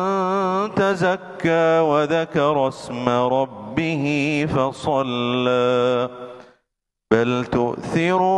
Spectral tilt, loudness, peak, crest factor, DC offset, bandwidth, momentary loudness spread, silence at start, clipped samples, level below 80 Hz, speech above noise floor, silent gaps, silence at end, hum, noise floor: -6.5 dB/octave; -20 LUFS; -2 dBFS; 18 dB; under 0.1%; 11.5 kHz; 6 LU; 0 s; under 0.1%; -54 dBFS; 59 dB; none; 0 s; none; -79 dBFS